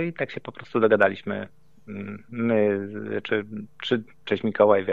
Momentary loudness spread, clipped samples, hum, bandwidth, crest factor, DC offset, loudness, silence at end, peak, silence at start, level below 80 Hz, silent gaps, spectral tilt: 17 LU; under 0.1%; none; 7.2 kHz; 20 dB; 0.3%; -25 LUFS; 0 s; -4 dBFS; 0 s; -68 dBFS; none; -7.5 dB/octave